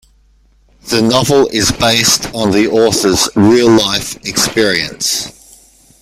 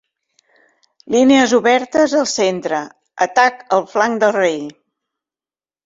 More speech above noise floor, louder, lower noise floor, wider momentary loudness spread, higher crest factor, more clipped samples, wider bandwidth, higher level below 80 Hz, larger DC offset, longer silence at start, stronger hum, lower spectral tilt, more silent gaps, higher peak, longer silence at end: second, 38 dB vs over 75 dB; first, -11 LUFS vs -15 LUFS; second, -50 dBFS vs under -90 dBFS; second, 7 LU vs 11 LU; about the same, 12 dB vs 16 dB; neither; first, 16.5 kHz vs 7.8 kHz; first, -40 dBFS vs -60 dBFS; neither; second, 0.85 s vs 1.1 s; neither; about the same, -3.5 dB/octave vs -3.5 dB/octave; neither; about the same, 0 dBFS vs -2 dBFS; second, 0.7 s vs 1.15 s